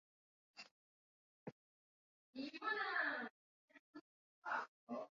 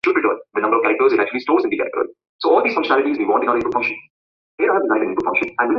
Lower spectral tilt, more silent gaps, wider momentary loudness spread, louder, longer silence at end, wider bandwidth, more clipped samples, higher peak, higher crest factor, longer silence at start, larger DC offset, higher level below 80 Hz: second, -0.5 dB/octave vs -6 dB/octave; first, 0.71-1.46 s, 1.52-2.33 s, 3.30-3.68 s, 3.79-3.94 s, 4.01-4.42 s, 4.68-4.87 s vs 2.29-2.39 s, 4.10-4.58 s; first, 22 LU vs 7 LU; second, -44 LUFS vs -18 LUFS; about the same, 0.05 s vs 0 s; about the same, 7.2 kHz vs 6.6 kHz; neither; second, -28 dBFS vs -2 dBFS; first, 22 dB vs 16 dB; first, 0.55 s vs 0.05 s; neither; second, under -90 dBFS vs -60 dBFS